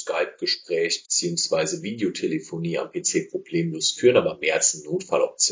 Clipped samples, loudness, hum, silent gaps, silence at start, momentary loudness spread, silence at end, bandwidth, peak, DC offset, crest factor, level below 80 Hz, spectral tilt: under 0.1%; -23 LUFS; none; none; 0 s; 8 LU; 0 s; 7.8 kHz; -4 dBFS; under 0.1%; 20 dB; -66 dBFS; -3 dB/octave